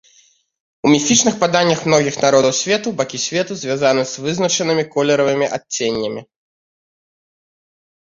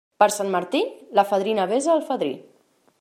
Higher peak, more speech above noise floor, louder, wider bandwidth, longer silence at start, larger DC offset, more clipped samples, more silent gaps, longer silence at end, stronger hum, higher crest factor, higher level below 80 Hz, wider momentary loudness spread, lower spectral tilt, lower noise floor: first, 0 dBFS vs -4 dBFS; about the same, 38 dB vs 39 dB; first, -16 LUFS vs -22 LUFS; second, 7.8 kHz vs 16 kHz; first, 0.85 s vs 0.2 s; neither; neither; neither; first, 1.95 s vs 0.6 s; neither; about the same, 18 dB vs 18 dB; first, -58 dBFS vs -72 dBFS; about the same, 8 LU vs 6 LU; about the same, -3.5 dB/octave vs -4 dB/octave; second, -55 dBFS vs -61 dBFS